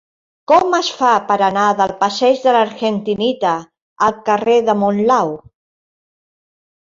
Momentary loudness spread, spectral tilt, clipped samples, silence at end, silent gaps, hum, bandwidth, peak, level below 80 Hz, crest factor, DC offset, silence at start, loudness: 6 LU; -4.5 dB/octave; under 0.1%; 1.45 s; 3.82-3.96 s; none; 7.6 kHz; -2 dBFS; -58 dBFS; 14 dB; under 0.1%; 0.5 s; -15 LUFS